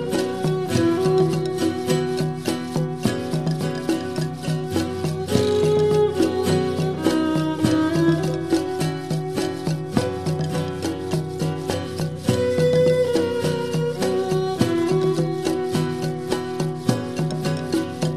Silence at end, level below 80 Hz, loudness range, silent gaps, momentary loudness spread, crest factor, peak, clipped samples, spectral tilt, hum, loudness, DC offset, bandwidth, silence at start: 0 s; -52 dBFS; 4 LU; none; 7 LU; 18 dB; -4 dBFS; under 0.1%; -6.5 dB/octave; none; -22 LUFS; 0.4%; 14 kHz; 0 s